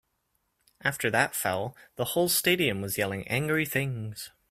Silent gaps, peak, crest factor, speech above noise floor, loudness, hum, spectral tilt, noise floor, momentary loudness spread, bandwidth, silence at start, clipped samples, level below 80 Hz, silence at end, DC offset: none; -8 dBFS; 22 dB; 48 dB; -27 LUFS; none; -3.5 dB/octave; -76 dBFS; 11 LU; 16 kHz; 0.85 s; under 0.1%; -62 dBFS; 0.25 s; under 0.1%